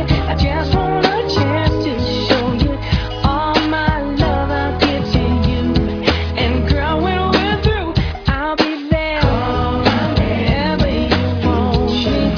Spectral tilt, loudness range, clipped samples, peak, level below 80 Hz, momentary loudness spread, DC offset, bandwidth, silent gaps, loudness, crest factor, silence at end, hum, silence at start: -7 dB/octave; 1 LU; under 0.1%; 0 dBFS; -24 dBFS; 3 LU; under 0.1%; 5.4 kHz; none; -16 LUFS; 16 dB; 0 s; none; 0 s